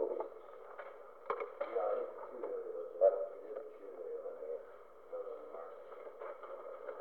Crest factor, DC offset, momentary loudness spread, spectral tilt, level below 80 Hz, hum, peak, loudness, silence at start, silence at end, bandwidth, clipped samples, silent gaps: 24 dB; under 0.1%; 18 LU; -6 dB/octave; -84 dBFS; 60 Hz at -85 dBFS; -18 dBFS; -41 LUFS; 0 s; 0 s; 4.3 kHz; under 0.1%; none